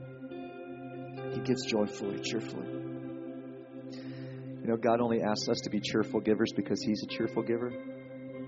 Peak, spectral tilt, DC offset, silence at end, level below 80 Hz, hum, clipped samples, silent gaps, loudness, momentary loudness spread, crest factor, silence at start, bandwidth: -14 dBFS; -5 dB/octave; under 0.1%; 0 s; -70 dBFS; none; under 0.1%; none; -33 LUFS; 15 LU; 20 dB; 0 s; 7.6 kHz